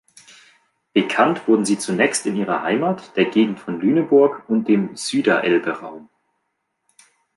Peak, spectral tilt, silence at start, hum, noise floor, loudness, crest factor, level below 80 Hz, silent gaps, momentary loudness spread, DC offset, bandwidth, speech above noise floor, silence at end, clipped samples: -2 dBFS; -5 dB/octave; 0.95 s; none; -74 dBFS; -19 LUFS; 18 dB; -68 dBFS; none; 7 LU; under 0.1%; 11.5 kHz; 55 dB; 1.35 s; under 0.1%